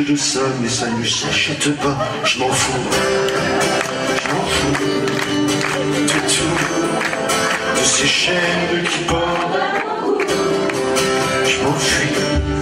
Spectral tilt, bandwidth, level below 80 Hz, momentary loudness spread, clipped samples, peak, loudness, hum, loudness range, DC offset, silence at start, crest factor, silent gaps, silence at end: -3 dB/octave; 16 kHz; -38 dBFS; 4 LU; under 0.1%; -2 dBFS; -17 LUFS; none; 2 LU; under 0.1%; 0 s; 16 dB; none; 0 s